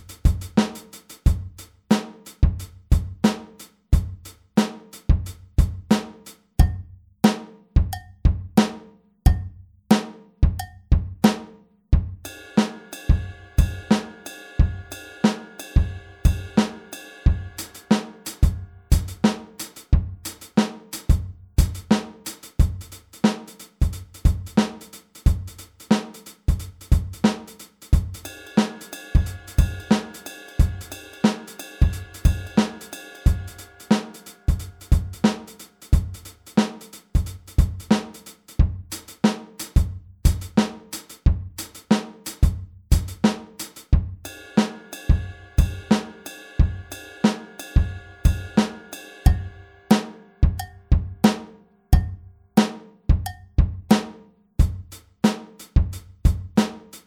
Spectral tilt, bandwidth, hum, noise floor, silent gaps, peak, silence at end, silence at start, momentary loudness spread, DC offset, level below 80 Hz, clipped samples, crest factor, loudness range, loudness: -6.5 dB/octave; 18.5 kHz; none; -47 dBFS; none; -2 dBFS; 0.1 s; 0.1 s; 15 LU; under 0.1%; -26 dBFS; under 0.1%; 22 dB; 2 LU; -24 LUFS